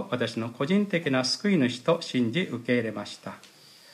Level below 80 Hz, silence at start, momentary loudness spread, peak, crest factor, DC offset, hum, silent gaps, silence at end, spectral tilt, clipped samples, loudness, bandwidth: -74 dBFS; 0 s; 13 LU; -12 dBFS; 16 dB; under 0.1%; none; none; 0.5 s; -5.5 dB/octave; under 0.1%; -27 LUFS; 14 kHz